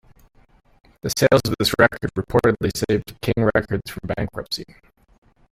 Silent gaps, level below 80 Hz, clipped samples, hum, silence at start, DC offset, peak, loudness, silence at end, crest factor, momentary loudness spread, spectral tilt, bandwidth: none; -44 dBFS; under 0.1%; none; 1.05 s; under 0.1%; -2 dBFS; -21 LUFS; 0.9 s; 20 dB; 12 LU; -5 dB/octave; 16 kHz